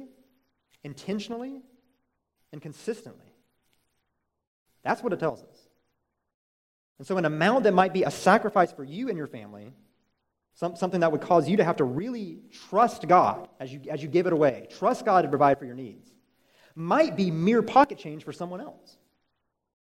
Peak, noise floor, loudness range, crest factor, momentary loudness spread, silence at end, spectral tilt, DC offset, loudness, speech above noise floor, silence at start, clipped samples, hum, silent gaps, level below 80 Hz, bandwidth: -4 dBFS; -78 dBFS; 14 LU; 24 dB; 20 LU; 1.15 s; -6.5 dB/octave; under 0.1%; -25 LUFS; 53 dB; 0 s; under 0.1%; none; 4.47-4.66 s, 6.34-6.96 s; -70 dBFS; 15.5 kHz